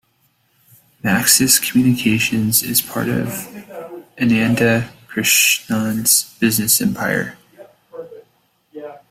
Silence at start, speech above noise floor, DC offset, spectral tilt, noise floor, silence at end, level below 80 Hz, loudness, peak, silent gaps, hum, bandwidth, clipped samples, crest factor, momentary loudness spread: 1.05 s; 45 dB; under 0.1%; -3 dB/octave; -62 dBFS; 0.15 s; -52 dBFS; -15 LUFS; 0 dBFS; none; none; 16 kHz; under 0.1%; 18 dB; 22 LU